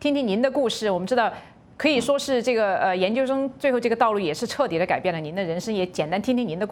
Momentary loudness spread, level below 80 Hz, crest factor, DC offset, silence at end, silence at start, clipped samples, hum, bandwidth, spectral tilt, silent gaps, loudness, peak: 5 LU; -60 dBFS; 16 dB; under 0.1%; 0 s; 0 s; under 0.1%; none; 17 kHz; -5 dB/octave; none; -23 LUFS; -6 dBFS